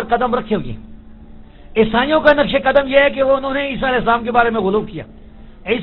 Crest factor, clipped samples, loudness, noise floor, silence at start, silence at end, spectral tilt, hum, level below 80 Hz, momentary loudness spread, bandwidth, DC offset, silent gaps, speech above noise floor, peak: 16 dB; under 0.1%; -15 LUFS; -38 dBFS; 0 s; 0 s; -8 dB/octave; none; -36 dBFS; 14 LU; 5.4 kHz; under 0.1%; none; 22 dB; 0 dBFS